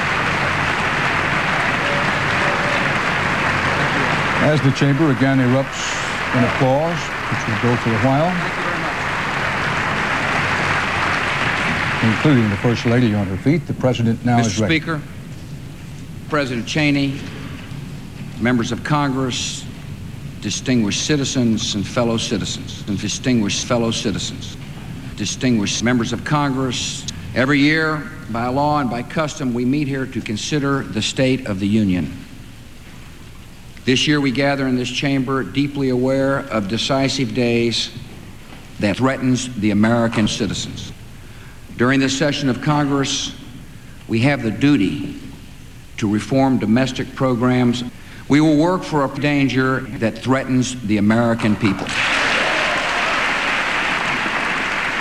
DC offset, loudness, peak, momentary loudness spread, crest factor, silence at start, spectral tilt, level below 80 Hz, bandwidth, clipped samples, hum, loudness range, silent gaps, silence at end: under 0.1%; -18 LUFS; -4 dBFS; 15 LU; 16 dB; 0 s; -5 dB/octave; -42 dBFS; 15 kHz; under 0.1%; none; 4 LU; none; 0 s